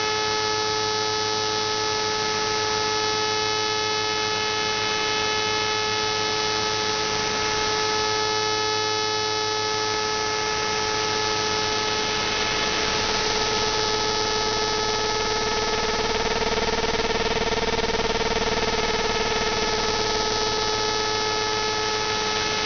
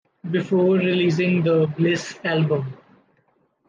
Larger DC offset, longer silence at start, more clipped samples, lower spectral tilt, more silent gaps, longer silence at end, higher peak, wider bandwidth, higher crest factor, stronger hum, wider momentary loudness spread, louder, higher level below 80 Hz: neither; second, 0 s vs 0.25 s; neither; second, -0.5 dB/octave vs -7 dB/octave; neither; second, 0 s vs 0.95 s; about the same, -6 dBFS vs -8 dBFS; second, 6.8 kHz vs 7.6 kHz; first, 18 dB vs 12 dB; neither; second, 1 LU vs 7 LU; about the same, -22 LUFS vs -21 LUFS; first, -40 dBFS vs -66 dBFS